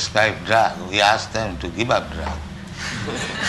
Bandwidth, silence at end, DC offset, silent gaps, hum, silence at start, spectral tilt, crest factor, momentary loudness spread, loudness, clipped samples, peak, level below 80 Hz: 12 kHz; 0 s; under 0.1%; none; none; 0 s; -3.5 dB/octave; 20 dB; 12 LU; -21 LUFS; under 0.1%; -2 dBFS; -38 dBFS